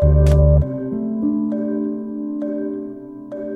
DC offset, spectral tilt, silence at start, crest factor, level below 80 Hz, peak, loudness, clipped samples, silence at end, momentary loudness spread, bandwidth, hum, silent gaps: under 0.1%; -10 dB/octave; 0 s; 14 dB; -22 dBFS; -4 dBFS; -19 LUFS; under 0.1%; 0 s; 16 LU; 6.4 kHz; none; none